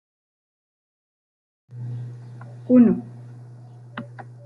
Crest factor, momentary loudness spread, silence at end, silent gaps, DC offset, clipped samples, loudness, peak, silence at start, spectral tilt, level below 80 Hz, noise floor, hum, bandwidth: 20 dB; 27 LU; 0.15 s; none; under 0.1%; under 0.1%; -19 LUFS; -4 dBFS; 1.75 s; -10.5 dB/octave; -68 dBFS; -43 dBFS; none; 3.9 kHz